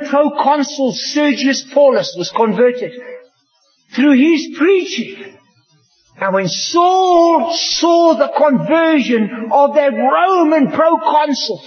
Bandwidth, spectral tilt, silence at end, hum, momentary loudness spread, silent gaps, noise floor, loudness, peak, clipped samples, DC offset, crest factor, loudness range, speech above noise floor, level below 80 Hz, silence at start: 6.6 kHz; -4 dB/octave; 0 s; none; 7 LU; none; -59 dBFS; -13 LUFS; 0 dBFS; under 0.1%; under 0.1%; 12 dB; 4 LU; 46 dB; -66 dBFS; 0 s